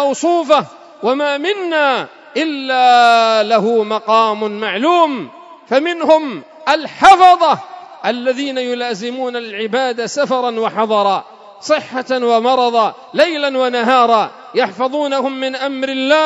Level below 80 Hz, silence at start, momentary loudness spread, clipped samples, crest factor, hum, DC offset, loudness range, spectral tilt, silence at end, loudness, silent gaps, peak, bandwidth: -56 dBFS; 0 s; 11 LU; 0.3%; 14 dB; none; under 0.1%; 5 LU; -3.5 dB/octave; 0 s; -14 LUFS; none; 0 dBFS; 11 kHz